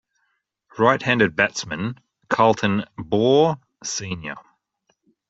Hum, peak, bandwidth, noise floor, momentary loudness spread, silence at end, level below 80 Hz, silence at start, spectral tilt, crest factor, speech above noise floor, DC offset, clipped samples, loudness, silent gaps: none; -2 dBFS; 8 kHz; -72 dBFS; 14 LU; 0.9 s; -60 dBFS; 0.75 s; -4.5 dB/octave; 20 dB; 52 dB; under 0.1%; under 0.1%; -21 LUFS; none